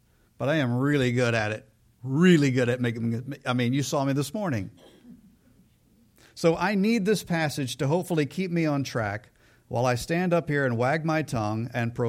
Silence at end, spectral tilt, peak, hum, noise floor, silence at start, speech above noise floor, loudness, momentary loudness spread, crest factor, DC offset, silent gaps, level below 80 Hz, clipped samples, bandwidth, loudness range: 0 s; -6 dB/octave; -8 dBFS; none; -61 dBFS; 0.4 s; 36 dB; -26 LUFS; 8 LU; 18 dB; under 0.1%; none; -58 dBFS; under 0.1%; 16 kHz; 5 LU